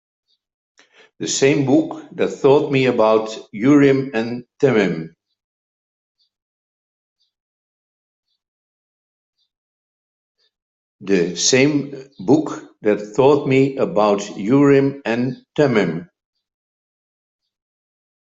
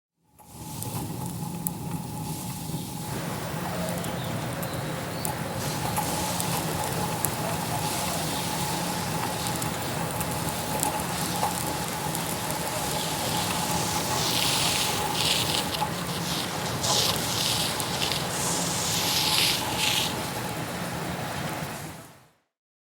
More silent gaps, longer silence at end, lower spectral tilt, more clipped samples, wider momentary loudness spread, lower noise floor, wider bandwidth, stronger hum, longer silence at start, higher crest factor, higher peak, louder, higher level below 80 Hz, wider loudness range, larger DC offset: first, 5.44-6.15 s, 6.42-7.16 s, 7.40-8.23 s, 8.48-9.33 s, 9.58-10.35 s, 10.62-10.99 s vs none; first, 2.2 s vs 0.6 s; first, -5 dB/octave vs -3 dB/octave; neither; first, 14 LU vs 10 LU; first, under -90 dBFS vs -56 dBFS; second, 8 kHz vs over 20 kHz; neither; first, 1.2 s vs 0.4 s; second, 18 dB vs 28 dB; about the same, -2 dBFS vs 0 dBFS; first, -17 LUFS vs -27 LUFS; second, -62 dBFS vs -52 dBFS; about the same, 8 LU vs 7 LU; neither